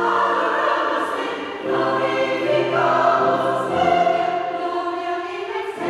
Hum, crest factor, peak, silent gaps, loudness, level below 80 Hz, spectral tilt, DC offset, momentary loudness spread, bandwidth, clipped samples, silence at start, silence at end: none; 16 dB; -4 dBFS; none; -20 LUFS; -62 dBFS; -5 dB/octave; under 0.1%; 9 LU; 12 kHz; under 0.1%; 0 s; 0 s